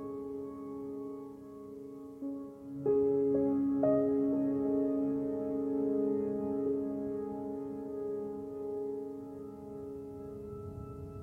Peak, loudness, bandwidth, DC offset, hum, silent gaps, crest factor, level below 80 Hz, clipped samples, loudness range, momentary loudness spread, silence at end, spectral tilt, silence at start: -16 dBFS; -35 LUFS; 2.6 kHz; under 0.1%; none; none; 18 dB; -64 dBFS; under 0.1%; 10 LU; 16 LU; 0 s; -10.5 dB/octave; 0 s